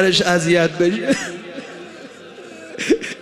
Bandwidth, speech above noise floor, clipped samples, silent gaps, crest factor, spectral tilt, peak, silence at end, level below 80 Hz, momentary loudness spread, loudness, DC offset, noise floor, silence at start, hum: 14.5 kHz; 21 dB; under 0.1%; none; 16 dB; -4 dB/octave; -2 dBFS; 0 s; -54 dBFS; 22 LU; -18 LUFS; under 0.1%; -38 dBFS; 0 s; none